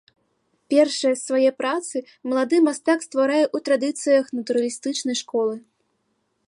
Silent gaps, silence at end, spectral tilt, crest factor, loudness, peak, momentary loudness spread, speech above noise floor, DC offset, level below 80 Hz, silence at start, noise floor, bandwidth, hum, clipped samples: none; 0.9 s; -2.5 dB/octave; 16 dB; -22 LUFS; -6 dBFS; 7 LU; 50 dB; under 0.1%; -80 dBFS; 0.7 s; -71 dBFS; 11.5 kHz; none; under 0.1%